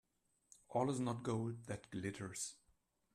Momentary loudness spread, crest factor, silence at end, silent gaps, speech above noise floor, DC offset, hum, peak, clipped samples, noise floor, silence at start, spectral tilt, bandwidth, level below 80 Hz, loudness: 8 LU; 20 dB; 0.6 s; none; 37 dB; under 0.1%; none; -24 dBFS; under 0.1%; -78 dBFS; 0.7 s; -5.5 dB/octave; 13.5 kHz; -74 dBFS; -43 LUFS